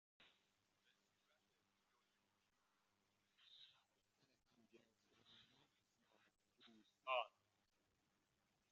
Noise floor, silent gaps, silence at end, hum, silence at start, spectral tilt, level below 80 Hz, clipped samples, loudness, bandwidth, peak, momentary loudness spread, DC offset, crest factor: -86 dBFS; none; 1.45 s; none; 3.5 s; 1.5 dB/octave; under -90 dBFS; under 0.1%; -48 LUFS; 7.2 kHz; -32 dBFS; 23 LU; under 0.1%; 30 dB